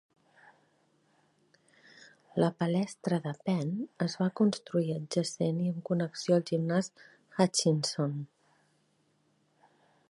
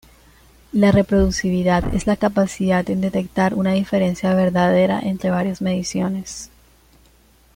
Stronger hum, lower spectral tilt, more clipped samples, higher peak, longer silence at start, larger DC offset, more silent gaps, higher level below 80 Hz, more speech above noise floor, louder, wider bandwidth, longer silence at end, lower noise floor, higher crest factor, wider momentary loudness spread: neither; about the same, -5.5 dB/octave vs -6.5 dB/octave; neither; second, -10 dBFS vs -4 dBFS; first, 2.35 s vs 0.75 s; neither; neither; second, -78 dBFS vs -36 dBFS; first, 42 dB vs 35 dB; second, -31 LUFS vs -19 LUFS; second, 11.5 kHz vs 15.5 kHz; first, 1.85 s vs 1.1 s; first, -72 dBFS vs -53 dBFS; first, 22 dB vs 14 dB; about the same, 7 LU vs 7 LU